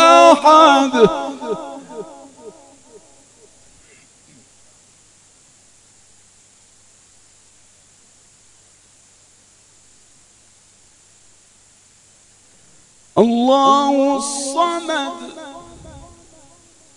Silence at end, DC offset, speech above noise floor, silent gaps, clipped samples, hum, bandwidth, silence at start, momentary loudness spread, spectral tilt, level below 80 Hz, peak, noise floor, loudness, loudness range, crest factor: 0.95 s; under 0.1%; 35 dB; none; under 0.1%; none; 12 kHz; 0 s; 28 LU; -3.5 dB/octave; -58 dBFS; 0 dBFS; -51 dBFS; -14 LUFS; 19 LU; 20 dB